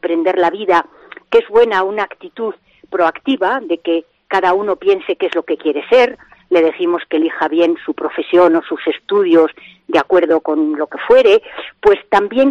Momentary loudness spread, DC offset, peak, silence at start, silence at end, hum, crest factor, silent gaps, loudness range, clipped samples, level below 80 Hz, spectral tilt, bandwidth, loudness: 9 LU; under 0.1%; 0 dBFS; 0.05 s; 0 s; none; 14 dB; none; 3 LU; under 0.1%; -54 dBFS; -5.5 dB/octave; 7.8 kHz; -15 LUFS